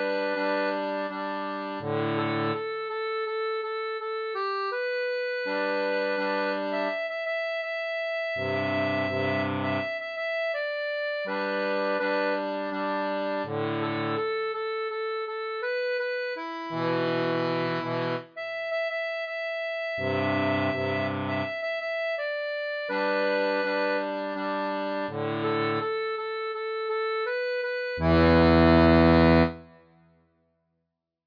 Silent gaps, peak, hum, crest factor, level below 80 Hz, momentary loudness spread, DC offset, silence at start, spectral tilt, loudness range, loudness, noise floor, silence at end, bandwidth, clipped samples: none; -8 dBFS; none; 18 dB; -46 dBFS; 7 LU; under 0.1%; 0 s; -8 dB/octave; 7 LU; -27 LUFS; -81 dBFS; 1.55 s; 5.2 kHz; under 0.1%